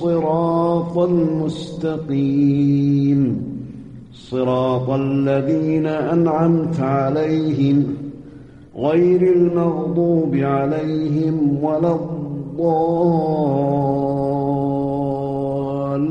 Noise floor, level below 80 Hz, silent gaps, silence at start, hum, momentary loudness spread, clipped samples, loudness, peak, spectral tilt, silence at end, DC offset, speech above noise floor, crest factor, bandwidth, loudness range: -40 dBFS; -50 dBFS; none; 0 s; none; 9 LU; under 0.1%; -18 LUFS; -4 dBFS; -9.5 dB/octave; 0 s; 0.1%; 23 dB; 12 dB; 8 kHz; 2 LU